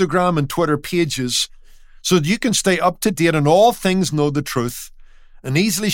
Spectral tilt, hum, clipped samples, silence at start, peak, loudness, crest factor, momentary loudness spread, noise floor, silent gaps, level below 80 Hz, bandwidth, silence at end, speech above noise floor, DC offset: -4.5 dB/octave; none; under 0.1%; 0 s; -2 dBFS; -18 LUFS; 16 dB; 11 LU; -42 dBFS; none; -44 dBFS; 17 kHz; 0 s; 24 dB; under 0.1%